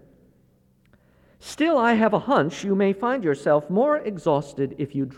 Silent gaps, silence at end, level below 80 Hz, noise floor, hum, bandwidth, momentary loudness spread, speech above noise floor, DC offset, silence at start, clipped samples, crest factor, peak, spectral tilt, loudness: none; 0.05 s; -62 dBFS; -60 dBFS; none; 12.5 kHz; 9 LU; 38 dB; under 0.1%; 1.45 s; under 0.1%; 16 dB; -8 dBFS; -6.5 dB/octave; -22 LUFS